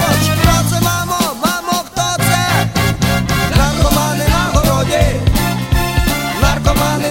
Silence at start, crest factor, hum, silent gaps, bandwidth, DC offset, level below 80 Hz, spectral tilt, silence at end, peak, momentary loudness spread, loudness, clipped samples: 0 s; 14 dB; none; none; 16.5 kHz; under 0.1%; -20 dBFS; -4.5 dB/octave; 0 s; 0 dBFS; 4 LU; -14 LUFS; under 0.1%